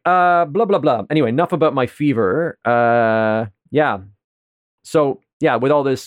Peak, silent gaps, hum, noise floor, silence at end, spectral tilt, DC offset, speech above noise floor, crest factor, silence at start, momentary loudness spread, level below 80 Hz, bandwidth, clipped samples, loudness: -4 dBFS; 4.24-4.78 s, 5.33-5.40 s; none; under -90 dBFS; 0 s; -7 dB/octave; under 0.1%; over 74 dB; 14 dB; 0.05 s; 6 LU; -64 dBFS; 14 kHz; under 0.1%; -17 LUFS